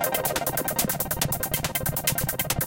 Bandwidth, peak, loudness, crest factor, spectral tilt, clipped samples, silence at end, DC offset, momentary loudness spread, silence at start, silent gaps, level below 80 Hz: 17.5 kHz; -8 dBFS; -25 LUFS; 20 dB; -3 dB/octave; under 0.1%; 0 s; under 0.1%; 1 LU; 0 s; none; -42 dBFS